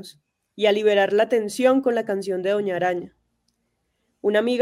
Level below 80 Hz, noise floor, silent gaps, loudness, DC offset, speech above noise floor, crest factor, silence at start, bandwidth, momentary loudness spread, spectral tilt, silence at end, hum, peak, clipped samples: -72 dBFS; -73 dBFS; none; -21 LUFS; under 0.1%; 52 dB; 16 dB; 0 s; 15 kHz; 7 LU; -5 dB/octave; 0 s; none; -6 dBFS; under 0.1%